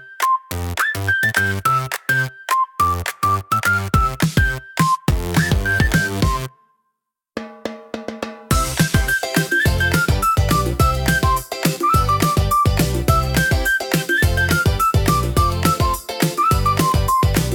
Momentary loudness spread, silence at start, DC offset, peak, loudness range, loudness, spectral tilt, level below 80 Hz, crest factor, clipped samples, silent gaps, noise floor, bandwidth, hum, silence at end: 5 LU; 0 s; under 0.1%; 0 dBFS; 5 LU; -18 LUFS; -4.5 dB/octave; -28 dBFS; 18 dB; under 0.1%; none; -75 dBFS; 18 kHz; none; 0 s